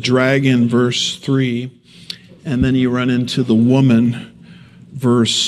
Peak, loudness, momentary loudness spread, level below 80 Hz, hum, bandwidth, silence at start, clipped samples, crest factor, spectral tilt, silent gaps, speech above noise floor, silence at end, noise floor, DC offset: 0 dBFS; -15 LUFS; 18 LU; -42 dBFS; none; 12 kHz; 0 s; under 0.1%; 14 dB; -5.5 dB/octave; none; 26 dB; 0 s; -41 dBFS; under 0.1%